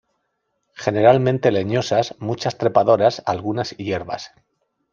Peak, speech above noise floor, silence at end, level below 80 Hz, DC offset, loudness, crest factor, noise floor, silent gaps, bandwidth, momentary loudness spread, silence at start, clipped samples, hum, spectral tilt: -2 dBFS; 54 dB; 0.65 s; -60 dBFS; under 0.1%; -19 LUFS; 18 dB; -73 dBFS; none; 7.4 kHz; 11 LU; 0.8 s; under 0.1%; none; -6 dB/octave